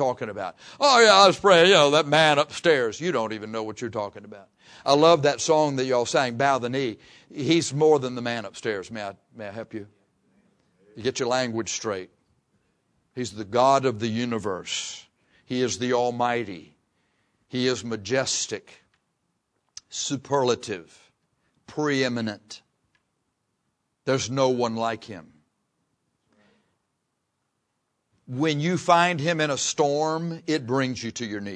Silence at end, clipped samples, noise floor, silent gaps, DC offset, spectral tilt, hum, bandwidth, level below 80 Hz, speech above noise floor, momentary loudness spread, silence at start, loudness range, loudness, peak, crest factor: 0 s; under 0.1%; -77 dBFS; none; under 0.1%; -4 dB/octave; none; 10.5 kHz; -68 dBFS; 54 dB; 18 LU; 0 s; 10 LU; -23 LUFS; -2 dBFS; 22 dB